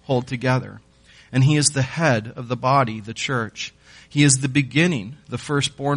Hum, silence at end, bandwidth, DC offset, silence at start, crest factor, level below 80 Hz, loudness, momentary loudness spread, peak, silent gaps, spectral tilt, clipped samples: none; 0 s; 10.5 kHz; under 0.1%; 0.1 s; 18 dB; -54 dBFS; -20 LUFS; 13 LU; -2 dBFS; none; -4.5 dB/octave; under 0.1%